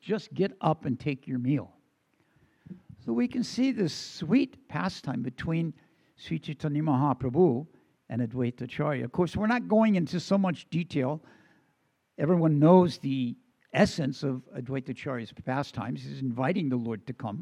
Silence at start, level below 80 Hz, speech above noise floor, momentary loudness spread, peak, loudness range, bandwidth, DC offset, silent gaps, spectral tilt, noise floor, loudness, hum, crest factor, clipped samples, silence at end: 0.05 s; -62 dBFS; 45 dB; 12 LU; -6 dBFS; 6 LU; 11 kHz; under 0.1%; none; -7.5 dB/octave; -73 dBFS; -29 LUFS; none; 22 dB; under 0.1%; 0 s